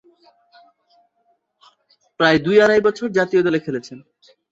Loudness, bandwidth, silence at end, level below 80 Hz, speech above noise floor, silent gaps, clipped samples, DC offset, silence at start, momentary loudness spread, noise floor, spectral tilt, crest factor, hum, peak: -17 LUFS; 7.8 kHz; 0.55 s; -58 dBFS; 48 dB; none; under 0.1%; under 0.1%; 2.2 s; 15 LU; -66 dBFS; -5.5 dB/octave; 18 dB; none; -2 dBFS